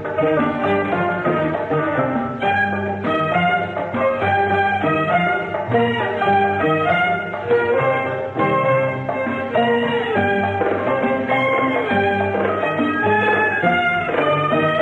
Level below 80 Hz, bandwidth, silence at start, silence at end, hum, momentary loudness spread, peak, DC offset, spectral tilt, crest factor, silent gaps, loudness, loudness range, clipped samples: -54 dBFS; 9.2 kHz; 0 s; 0 s; none; 4 LU; -4 dBFS; under 0.1%; -7.5 dB/octave; 14 dB; none; -18 LUFS; 2 LU; under 0.1%